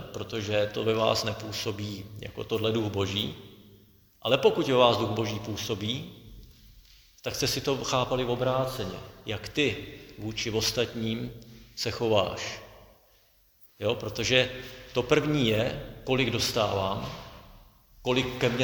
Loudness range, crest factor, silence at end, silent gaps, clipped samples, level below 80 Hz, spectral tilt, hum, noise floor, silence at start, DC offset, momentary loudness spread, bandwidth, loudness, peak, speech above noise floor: 4 LU; 24 dB; 0 s; none; under 0.1%; -52 dBFS; -4.5 dB/octave; none; -63 dBFS; 0 s; under 0.1%; 15 LU; over 20 kHz; -28 LUFS; -6 dBFS; 35 dB